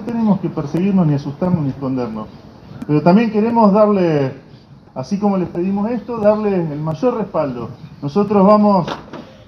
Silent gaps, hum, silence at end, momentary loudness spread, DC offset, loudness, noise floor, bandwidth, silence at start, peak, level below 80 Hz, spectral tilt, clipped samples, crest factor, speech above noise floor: none; none; 0.15 s; 17 LU; under 0.1%; -16 LUFS; -42 dBFS; 6.4 kHz; 0 s; 0 dBFS; -48 dBFS; -9 dB/octave; under 0.1%; 16 dB; 26 dB